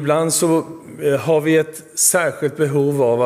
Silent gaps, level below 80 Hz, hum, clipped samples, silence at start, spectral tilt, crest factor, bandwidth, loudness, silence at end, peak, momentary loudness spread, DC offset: none; -64 dBFS; none; under 0.1%; 0 s; -4 dB/octave; 16 dB; 16 kHz; -17 LUFS; 0 s; -2 dBFS; 7 LU; under 0.1%